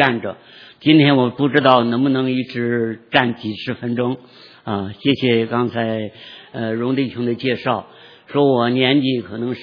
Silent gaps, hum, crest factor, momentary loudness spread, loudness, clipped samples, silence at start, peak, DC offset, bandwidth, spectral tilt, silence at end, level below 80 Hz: none; none; 18 dB; 12 LU; -18 LUFS; under 0.1%; 0 s; 0 dBFS; under 0.1%; 5.4 kHz; -8.5 dB/octave; 0 s; -62 dBFS